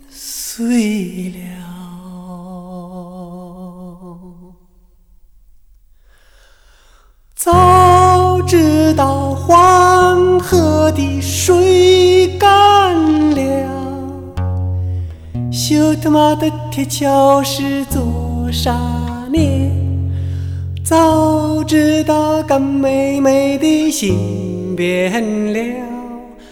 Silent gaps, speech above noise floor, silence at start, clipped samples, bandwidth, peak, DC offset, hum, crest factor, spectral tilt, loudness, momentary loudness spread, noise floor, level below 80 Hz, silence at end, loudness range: none; 34 dB; 0.15 s; under 0.1%; 18 kHz; 0 dBFS; under 0.1%; none; 14 dB; -5.5 dB/octave; -13 LUFS; 22 LU; -48 dBFS; -34 dBFS; 0.05 s; 12 LU